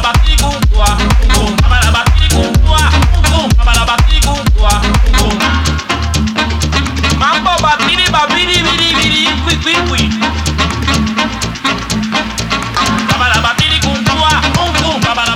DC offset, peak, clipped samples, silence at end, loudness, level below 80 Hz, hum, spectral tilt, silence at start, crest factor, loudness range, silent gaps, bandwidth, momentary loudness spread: under 0.1%; 0 dBFS; under 0.1%; 0 s; -11 LUFS; -14 dBFS; none; -4 dB/octave; 0 s; 10 dB; 3 LU; none; 16 kHz; 5 LU